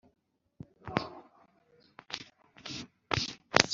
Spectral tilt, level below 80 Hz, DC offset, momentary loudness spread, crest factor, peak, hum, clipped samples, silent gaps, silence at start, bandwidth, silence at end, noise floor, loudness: -2 dB/octave; -64 dBFS; under 0.1%; 24 LU; 36 dB; 0 dBFS; none; under 0.1%; none; 0.85 s; 7.8 kHz; 0 s; -66 dBFS; -35 LUFS